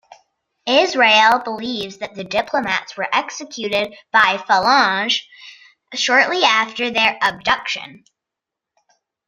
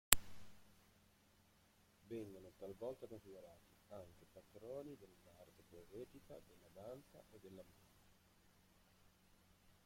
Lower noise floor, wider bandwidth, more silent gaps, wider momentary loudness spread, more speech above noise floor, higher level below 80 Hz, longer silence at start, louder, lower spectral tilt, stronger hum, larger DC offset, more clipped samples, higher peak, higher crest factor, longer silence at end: first, -84 dBFS vs -73 dBFS; about the same, 15.5 kHz vs 16.5 kHz; neither; about the same, 14 LU vs 15 LU; first, 66 dB vs 17 dB; first, -60 dBFS vs -66 dBFS; first, 0.65 s vs 0.1 s; first, -16 LUFS vs -47 LUFS; about the same, -2 dB/octave vs -1.5 dB/octave; neither; neither; neither; first, 0 dBFS vs -6 dBFS; second, 18 dB vs 46 dB; first, 1.3 s vs 0.15 s